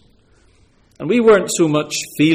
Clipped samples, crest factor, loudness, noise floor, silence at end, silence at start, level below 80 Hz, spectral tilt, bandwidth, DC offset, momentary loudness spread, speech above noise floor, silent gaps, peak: under 0.1%; 14 dB; -15 LUFS; -53 dBFS; 0 s; 1 s; -54 dBFS; -4.5 dB/octave; 16 kHz; under 0.1%; 10 LU; 39 dB; none; -2 dBFS